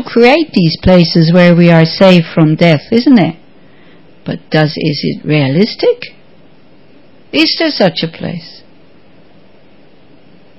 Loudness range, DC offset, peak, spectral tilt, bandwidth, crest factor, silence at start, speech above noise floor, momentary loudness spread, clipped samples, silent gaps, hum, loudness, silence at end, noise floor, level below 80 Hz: 8 LU; 1%; 0 dBFS; -8 dB/octave; 8 kHz; 12 dB; 0 s; 35 dB; 14 LU; 1%; none; none; -9 LUFS; 2.1 s; -44 dBFS; -36 dBFS